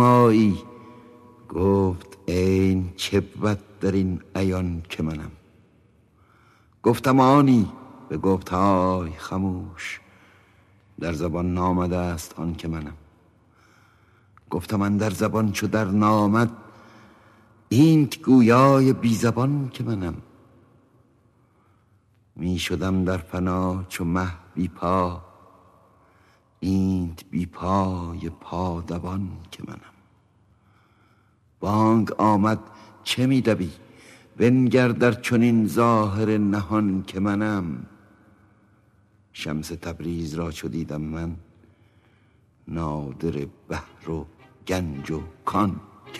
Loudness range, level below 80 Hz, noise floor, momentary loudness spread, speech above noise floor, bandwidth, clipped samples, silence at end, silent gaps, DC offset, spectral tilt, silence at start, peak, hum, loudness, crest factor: 12 LU; -48 dBFS; -61 dBFS; 16 LU; 39 dB; 14 kHz; under 0.1%; 0 s; none; under 0.1%; -7 dB/octave; 0 s; -2 dBFS; none; -23 LUFS; 20 dB